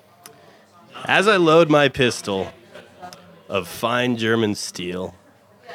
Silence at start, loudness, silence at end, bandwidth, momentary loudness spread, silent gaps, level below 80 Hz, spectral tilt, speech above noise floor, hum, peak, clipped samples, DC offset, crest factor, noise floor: 0.95 s; -19 LUFS; 0 s; 16.5 kHz; 20 LU; none; -58 dBFS; -4.5 dB/octave; 32 dB; none; -2 dBFS; under 0.1%; under 0.1%; 20 dB; -51 dBFS